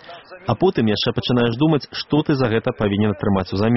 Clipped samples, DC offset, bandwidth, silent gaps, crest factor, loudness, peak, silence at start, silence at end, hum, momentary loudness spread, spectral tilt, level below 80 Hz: under 0.1%; 0.2%; 6 kHz; none; 16 dB; -19 LUFS; -4 dBFS; 0.05 s; 0 s; none; 4 LU; -5.5 dB/octave; -46 dBFS